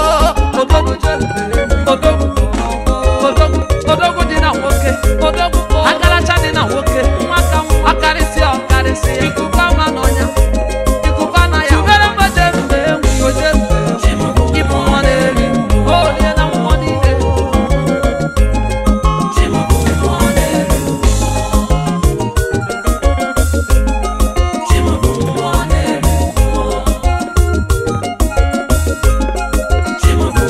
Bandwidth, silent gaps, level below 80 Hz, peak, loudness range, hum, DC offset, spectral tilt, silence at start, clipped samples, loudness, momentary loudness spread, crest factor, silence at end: 15 kHz; none; -16 dBFS; 0 dBFS; 3 LU; none; under 0.1%; -5.5 dB/octave; 0 s; 0.1%; -13 LUFS; 5 LU; 12 dB; 0 s